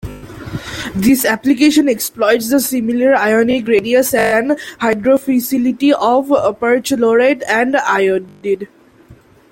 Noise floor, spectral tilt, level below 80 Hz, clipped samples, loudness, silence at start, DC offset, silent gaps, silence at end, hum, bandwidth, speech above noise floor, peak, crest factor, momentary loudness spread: -44 dBFS; -4 dB/octave; -46 dBFS; under 0.1%; -14 LUFS; 0.05 s; under 0.1%; none; 0.4 s; none; 17 kHz; 31 dB; -2 dBFS; 14 dB; 9 LU